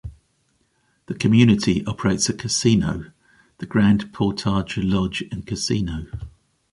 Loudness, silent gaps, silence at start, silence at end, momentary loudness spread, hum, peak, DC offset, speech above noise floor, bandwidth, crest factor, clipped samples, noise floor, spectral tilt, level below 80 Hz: -21 LUFS; none; 0.05 s; 0.45 s; 18 LU; none; -2 dBFS; under 0.1%; 46 dB; 11.5 kHz; 18 dB; under 0.1%; -66 dBFS; -5 dB/octave; -42 dBFS